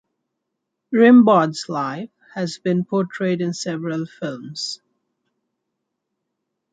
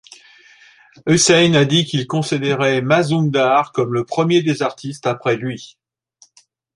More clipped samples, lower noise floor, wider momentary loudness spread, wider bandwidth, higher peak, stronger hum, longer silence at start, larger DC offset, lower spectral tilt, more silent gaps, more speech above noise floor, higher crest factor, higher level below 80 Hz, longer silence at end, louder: neither; first, -79 dBFS vs -56 dBFS; first, 17 LU vs 11 LU; second, 9.2 kHz vs 11.5 kHz; about the same, -2 dBFS vs -2 dBFS; neither; second, 0.9 s vs 1.05 s; neither; first, -6 dB/octave vs -4.5 dB/octave; neither; first, 60 dB vs 39 dB; about the same, 18 dB vs 16 dB; second, -70 dBFS vs -56 dBFS; first, 2 s vs 1.1 s; second, -19 LUFS vs -16 LUFS